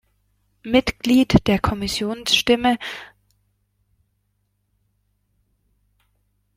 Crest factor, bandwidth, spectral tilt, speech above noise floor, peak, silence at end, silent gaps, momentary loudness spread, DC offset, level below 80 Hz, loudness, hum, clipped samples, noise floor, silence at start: 22 dB; 16 kHz; -4.5 dB/octave; 51 dB; -2 dBFS; 3.5 s; none; 13 LU; under 0.1%; -42 dBFS; -19 LUFS; 50 Hz at -50 dBFS; under 0.1%; -70 dBFS; 0.65 s